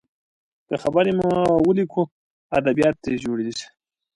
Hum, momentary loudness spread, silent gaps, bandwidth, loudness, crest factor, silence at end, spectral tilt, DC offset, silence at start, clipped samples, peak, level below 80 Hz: none; 11 LU; 2.11-2.50 s; 11.5 kHz; -21 LUFS; 16 dB; 0.5 s; -6.5 dB/octave; under 0.1%; 0.7 s; under 0.1%; -6 dBFS; -52 dBFS